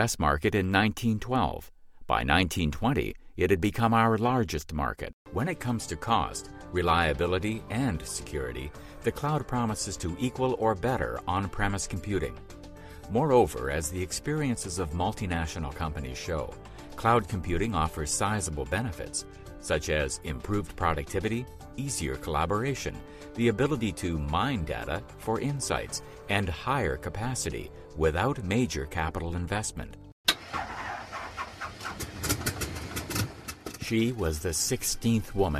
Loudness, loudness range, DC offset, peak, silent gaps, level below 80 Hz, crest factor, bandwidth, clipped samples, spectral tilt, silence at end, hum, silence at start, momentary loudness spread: -29 LUFS; 4 LU; under 0.1%; -8 dBFS; 5.13-5.25 s, 30.12-30.24 s; -44 dBFS; 22 dB; 16 kHz; under 0.1%; -4.5 dB/octave; 0 s; none; 0 s; 12 LU